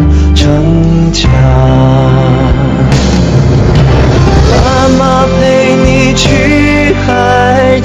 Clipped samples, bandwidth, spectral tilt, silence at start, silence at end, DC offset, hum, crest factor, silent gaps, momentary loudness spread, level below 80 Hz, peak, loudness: under 0.1%; 8.8 kHz; -6.5 dB/octave; 0 s; 0 s; under 0.1%; none; 6 dB; none; 2 LU; -14 dBFS; 0 dBFS; -7 LUFS